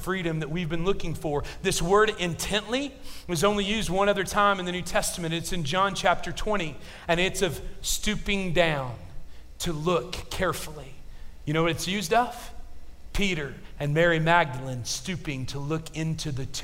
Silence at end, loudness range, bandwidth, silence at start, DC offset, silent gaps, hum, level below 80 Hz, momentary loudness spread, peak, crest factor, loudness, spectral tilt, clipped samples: 0 s; 4 LU; 16 kHz; 0 s; under 0.1%; none; none; -40 dBFS; 12 LU; -8 dBFS; 20 dB; -27 LUFS; -4 dB/octave; under 0.1%